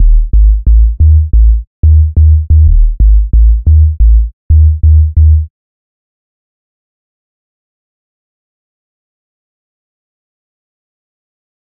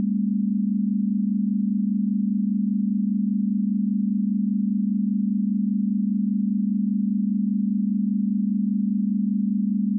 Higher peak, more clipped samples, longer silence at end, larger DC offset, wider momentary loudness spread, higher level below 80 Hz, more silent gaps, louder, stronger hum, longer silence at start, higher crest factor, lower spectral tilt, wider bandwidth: first, 0 dBFS vs -16 dBFS; first, 0.2% vs under 0.1%; first, 6.2 s vs 0 s; neither; first, 4 LU vs 0 LU; first, -10 dBFS vs under -90 dBFS; first, 1.67-1.83 s, 4.33-4.50 s vs none; first, -9 LUFS vs -23 LUFS; neither; about the same, 0 s vs 0 s; about the same, 8 dB vs 8 dB; about the same, -17.5 dB/octave vs -17 dB/octave; first, 0.6 kHz vs 0.3 kHz